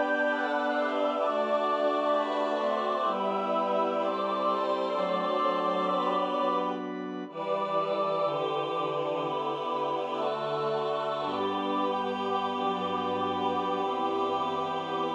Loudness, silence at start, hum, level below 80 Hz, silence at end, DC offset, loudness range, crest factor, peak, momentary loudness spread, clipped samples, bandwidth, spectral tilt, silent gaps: -29 LUFS; 0 s; none; -82 dBFS; 0 s; under 0.1%; 2 LU; 14 dB; -14 dBFS; 4 LU; under 0.1%; 9.4 kHz; -6 dB/octave; none